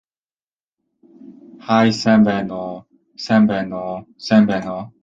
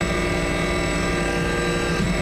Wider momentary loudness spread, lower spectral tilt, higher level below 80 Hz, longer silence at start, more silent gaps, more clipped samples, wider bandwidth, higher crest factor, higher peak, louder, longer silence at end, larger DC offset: first, 16 LU vs 0 LU; first, -6.5 dB/octave vs -5 dB/octave; second, -56 dBFS vs -30 dBFS; first, 1.25 s vs 0 s; neither; neither; second, 7.6 kHz vs 15 kHz; first, 18 dB vs 12 dB; first, -2 dBFS vs -10 dBFS; first, -17 LUFS vs -22 LUFS; first, 0.15 s vs 0 s; neither